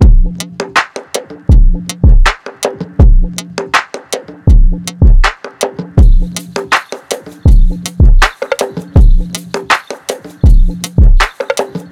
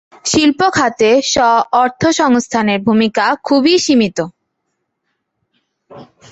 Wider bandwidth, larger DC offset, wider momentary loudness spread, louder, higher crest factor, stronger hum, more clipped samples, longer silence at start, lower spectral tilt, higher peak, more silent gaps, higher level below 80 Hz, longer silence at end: first, 13 kHz vs 8.2 kHz; neither; first, 11 LU vs 4 LU; about the same, -13 LUFS vs -13 LUFS; second, 8 dB vs 14 dB; neither; neither; second, 0 s vs 0.25 s; first, -5 dB/octave vs -3.5 dB/octave; about the same, 0 dBFS vs 0 dBFS; neither; first, -10 dBFS vs -48 dBFS; second, 0.1 s vs 0.25 s